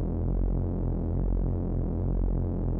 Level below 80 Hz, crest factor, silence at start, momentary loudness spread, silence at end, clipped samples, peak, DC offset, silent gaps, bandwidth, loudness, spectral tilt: -30 dBFS; 12 dB; 0 s; 1 LU; 0 s; under 0.1%; -16 dBFS; under 0.1%; none; 1.9 kHz; -30 LUFS; -14 dB/octave